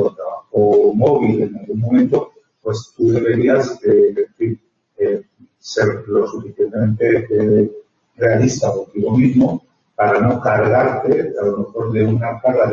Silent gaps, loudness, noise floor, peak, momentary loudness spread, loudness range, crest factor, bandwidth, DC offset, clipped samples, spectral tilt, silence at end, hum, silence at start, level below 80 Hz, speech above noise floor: none; -16 LUFS; -41 dBFS; -2 dBFS; 10 LU; 3 LU; 14 dB; 7.4 kHz; under 0.1%; under 0.1%; -7.5 dB/octave; 0 s; none; 0 s; -52 dBFS; 25 dB